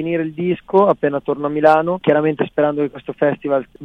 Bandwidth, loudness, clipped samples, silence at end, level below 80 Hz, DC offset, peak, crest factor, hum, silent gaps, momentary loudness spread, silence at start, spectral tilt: 5.8 kHz; -17 LUFS; under 0.1%; 0 s; -56 dBFS; under 0.1%; 0 dBFS; 16 dB; none; none; 8 LU; 0 s; -8.5 dB/octave